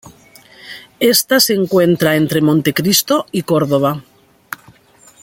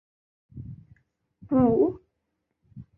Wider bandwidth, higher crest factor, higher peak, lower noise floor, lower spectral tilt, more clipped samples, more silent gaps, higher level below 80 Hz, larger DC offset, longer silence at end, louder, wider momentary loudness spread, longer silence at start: first, 17 kHz vs 2.9 kHz; about the same, 16 dB vs 18 dB; first, 0 dBFS vs -10 dBFS; second, -47 dBFS vs -79 dBFS; second, -4 dB/octave vs -13 dB/octave; neither; neither; about the same, -54 dBFS vs -54 dBFS; neither; first, 1.2 s vs 0.15 s; first, -13 LUFS vs -23 LUFS; second, 19 LU vs 23 LU; second, 0.05 s vs 0.55 s